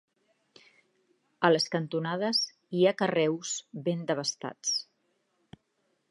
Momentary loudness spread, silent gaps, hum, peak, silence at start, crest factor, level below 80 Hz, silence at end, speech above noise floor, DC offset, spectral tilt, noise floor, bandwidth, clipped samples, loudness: 8 LU; none; none; -8 dBFS; 1.4 s; 24 dB; -80 dBFS; 1.3 s; 47 dB; under 0.1%; -4 dB/octave; -76 dBFS; 11.5 kHz; under 0.1%; -29 LUFS